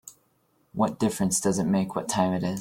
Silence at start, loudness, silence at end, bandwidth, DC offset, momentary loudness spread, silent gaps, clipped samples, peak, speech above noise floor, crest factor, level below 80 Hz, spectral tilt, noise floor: 0.05 s; -26 LUFS; 0 s; 16.5 kHz; under 0.1%; 4 LU; none; under 0.1%; -10 dBFS; 42 dB; 18 dB; -58 dBFS; -5 dB/octave; -68 dBFS